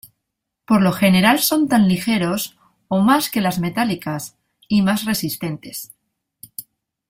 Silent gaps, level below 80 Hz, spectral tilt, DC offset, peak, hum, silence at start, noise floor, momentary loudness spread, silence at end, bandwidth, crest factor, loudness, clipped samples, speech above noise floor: none; -54 dBFS; -5 dB/octave; under 0.1%; -2 dBFS; none; 0.7 s; -79 dBFS; 19 LU; 0.5 s; 16.5 kHz; 18 dB; -18 LUFS; under 0.1%; 61 dB